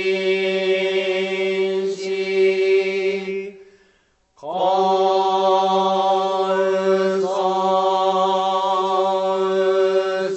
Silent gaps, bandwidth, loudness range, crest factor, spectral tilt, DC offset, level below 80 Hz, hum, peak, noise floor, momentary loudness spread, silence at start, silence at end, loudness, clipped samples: none; 8.4 kHz; 3 LU; 14 dB; -5 dB/octave; under 0.1%; -72 dBFS; none; -6 dBFS; -61 dBFS; 6 LU; 0 s; 0 s; -19 LUFS; under 0.1%